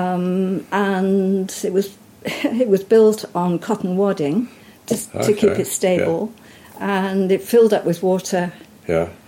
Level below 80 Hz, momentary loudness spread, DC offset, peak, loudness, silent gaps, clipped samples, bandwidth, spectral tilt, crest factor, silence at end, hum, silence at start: -58 dBFS; 12 LU; under 0.1%; -4 dBFS; -19 LUFS; none; under 0.1%; 16.5 kHz; -5.5 dB/octave; 14 dB; 0.1 s; none; 0 s